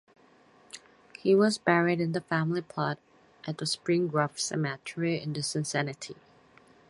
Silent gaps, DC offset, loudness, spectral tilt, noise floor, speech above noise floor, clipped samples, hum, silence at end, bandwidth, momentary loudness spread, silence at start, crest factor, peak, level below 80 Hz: none; under 0.1%; -29 LUFS; -5 dB/octave; -60 dBFS; 31 dB; under 0.1%; none; 0.75 s; 11.5 kHz; 19 LU; 0.75 s; 22 dB; -8 dBFS; -72 dBFS